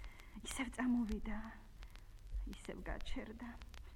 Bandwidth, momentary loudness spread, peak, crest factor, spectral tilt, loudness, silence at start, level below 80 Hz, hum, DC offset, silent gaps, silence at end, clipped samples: 17 kHz; 20 LU; -24 dBFS; 20 dB; -4.5 dB/octave; -44 LUFS; 0 s; -50 dBFS; none; under 0.1%; none; 0 s; under 0.1%